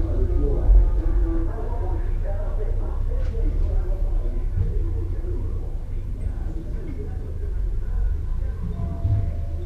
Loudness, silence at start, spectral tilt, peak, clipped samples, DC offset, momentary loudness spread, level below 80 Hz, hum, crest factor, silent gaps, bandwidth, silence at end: -27 LUFS; 0 s; -9.5 dB/octave; -6 dBFS; under 0.1%; under 0.1%; 8 LU; -22 dBFS; none; 16 dB; none; 2.5 kHz; 0 s